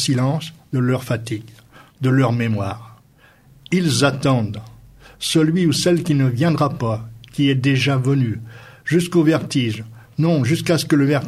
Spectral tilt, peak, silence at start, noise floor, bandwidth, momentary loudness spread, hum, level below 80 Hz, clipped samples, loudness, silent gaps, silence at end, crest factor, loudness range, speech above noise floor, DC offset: -6 dB/octave; -2 dBFS; 0 s; -51 dBFS; 15 kHz; 12 LU; none; -52 dBFS; under 0.1%; -19 LUFS; none; 0 s; 16 dB; 4 LU; 33 dB; under 0.1%